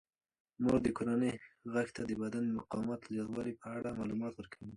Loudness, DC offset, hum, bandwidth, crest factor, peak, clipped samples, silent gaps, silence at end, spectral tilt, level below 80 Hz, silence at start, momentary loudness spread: -37 LUFS; under 0.1%; none; 11 kHz; 18 dB; -18 dBFS; under 0.1%; none; 0 s; -7 dB/octave; -62 dBFS; 0.6 s; 9 LU